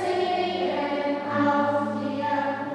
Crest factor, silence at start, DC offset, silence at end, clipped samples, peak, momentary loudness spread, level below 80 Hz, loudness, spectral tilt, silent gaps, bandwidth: 14 dB; 0 s; under 0.1%; 0 s; under 0.1%; -10 dBFS; 4 LU; -72 dBFS; -25 LUFS; -6 dB/octave; none; 10.5 kHz